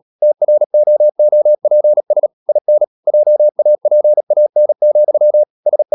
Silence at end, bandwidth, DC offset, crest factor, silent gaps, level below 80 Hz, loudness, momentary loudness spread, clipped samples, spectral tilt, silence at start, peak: 0 s; 1.1 kHz; under 0.1%; 6 dB; 0.66-0.70 s, 2.33-2.46 s, 2.61-2.65 s, 2.87-3.03 s, 4.23-4.27 s, 5.50-5.63 s; -80 dBFS; -12 LUFS; 5 LU; under 0.1%; -11 dB/octave; 0.2 s; -4 dBFS